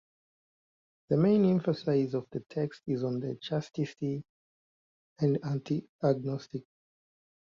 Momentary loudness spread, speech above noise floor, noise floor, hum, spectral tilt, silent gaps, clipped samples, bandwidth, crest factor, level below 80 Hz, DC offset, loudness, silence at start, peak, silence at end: 11 LU; over 60 dB; under -90 dBFS; none; -8.5 dB/octave; 4.29-5.16 s, 5.89-5.99 s; under 0.1%; 7.4 kHz; 18 dB; -70 dBFS; under 0.1%; -31 LUFS; 1.1 s; -14 dBFS; 0.95 s